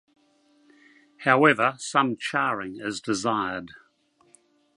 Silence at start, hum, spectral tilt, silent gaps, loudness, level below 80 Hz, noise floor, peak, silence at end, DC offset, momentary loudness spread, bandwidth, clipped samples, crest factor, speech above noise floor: 1.2 s; none; -4 dB/octave; none; -24 LUFS; -68 dBFS; -64 dBFS; -4 dBFS; 1 s; under 0.1%; 13 LU; 11.5 kHz; under 0.1%; 24 dB; 40 dB